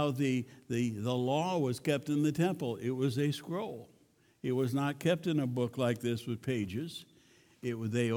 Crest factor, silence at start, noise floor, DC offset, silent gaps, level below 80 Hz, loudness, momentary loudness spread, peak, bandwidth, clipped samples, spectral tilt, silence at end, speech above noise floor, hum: 16 dB; 0 s; -67 dBFS; under 0.1%; none; -72 dBFS; -34 LUFS; 9 LU; -16 dBFS; 18.5 kHz; under 0.1%; -6.5 dB/octave; 0 s; 34 dB; none